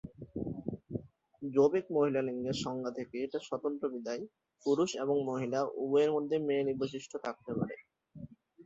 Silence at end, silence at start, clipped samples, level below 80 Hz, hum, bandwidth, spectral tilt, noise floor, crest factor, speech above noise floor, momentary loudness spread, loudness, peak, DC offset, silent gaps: 0.05 s; 0.05 s; under 0.1%; -66 dBFS; none; 8 kHz; -6 dB/octave; -53 dBFS; 18 dB; 20 dB; 15 LU; -34 LUFS; -16 dBFS; under 0.1%; none